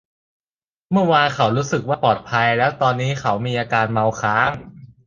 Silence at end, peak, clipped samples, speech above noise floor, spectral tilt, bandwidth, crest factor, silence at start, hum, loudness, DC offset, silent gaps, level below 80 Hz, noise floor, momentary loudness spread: 0.2 s; -2 dBFS; under 0.1%; over 72 dB; -5.5 dB/octave; 7.6 kHz; 18 dB; 0.9 s; none; -19 LUFS; under 0.1%; none; -52 dBFS; under -90 dBFS; 5 LU